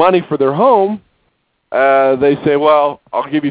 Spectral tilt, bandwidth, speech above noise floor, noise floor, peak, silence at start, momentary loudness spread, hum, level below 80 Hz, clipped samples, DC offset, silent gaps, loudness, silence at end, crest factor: -10 dB/octave; 4 kHz; 51 dB; -63 dBFS; 0 dBFS; 0 s; 8 LU; none; -54 dBFS; under 0.1%; under 0.1%; none; -13 LUFS; 0 s; 12 dB